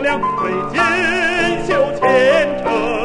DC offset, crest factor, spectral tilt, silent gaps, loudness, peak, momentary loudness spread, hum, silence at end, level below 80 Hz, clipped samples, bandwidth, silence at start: under 0.1%; 14 dB; -4.5 dB/octave; none; -15 LUFS; -2 dBFS; 6 LU; none; 0 s; -40 dBFS; under 0.1%; 10.5 kHz; 0 s